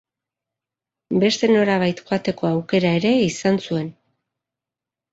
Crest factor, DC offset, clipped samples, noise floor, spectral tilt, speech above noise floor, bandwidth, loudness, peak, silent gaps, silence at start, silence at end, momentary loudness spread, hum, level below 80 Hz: 16 dB; under 0.1%; under 0.1%; -88 dBFS; -5.5 dB/octave; 69 dB; 8 kHz; -20 LUFS; -4 dBFS; none; 1.1 s; 1.2 s; 8 LU; none; -60 dBFS